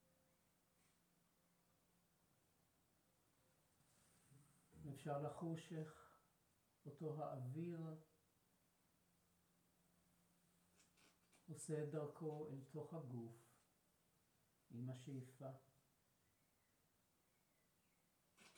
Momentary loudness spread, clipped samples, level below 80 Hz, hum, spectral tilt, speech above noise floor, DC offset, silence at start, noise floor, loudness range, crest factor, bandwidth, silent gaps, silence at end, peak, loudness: 13 LU; under 0.1%; under -90 dBFS; none; -7 dB/octave; 31 dB; under 0.1%; 4.3 s; -83 dBFS; 8 LU; 22 dB; over 20 kHz; none; 0.05 s; -36 dBFS; -53 LUFS